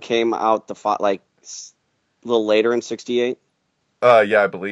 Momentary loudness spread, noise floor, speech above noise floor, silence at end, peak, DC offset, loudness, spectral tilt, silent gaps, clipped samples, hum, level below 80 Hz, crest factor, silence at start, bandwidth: 21 LU; -70 dBFS; 51 dB; 0 s; 0 dBFS; under 0.1%; -19 LUFS; -4 dB/octave; none; under 0.1%; none; -72 dBFS; 20 dB; 0 s; 9.8 kHz